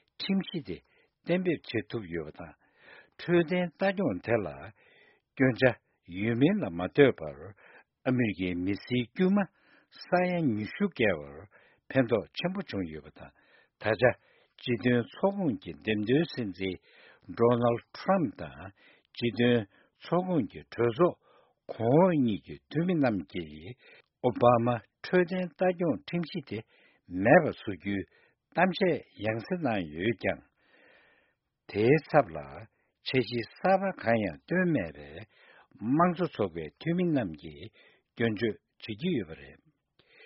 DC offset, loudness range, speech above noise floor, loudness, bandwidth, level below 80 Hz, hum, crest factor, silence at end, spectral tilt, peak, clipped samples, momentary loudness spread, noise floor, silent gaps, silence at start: under 0.1%; 3 LU; 45 dB; -29 LUFS; 5.8 kHz; -62 dBFS; none; 24 dB; 0.75 s; -5.5 dB/octave; -6 dBFS; under 0.1%; 19 LU; -74 dBFS; none; 0.2 s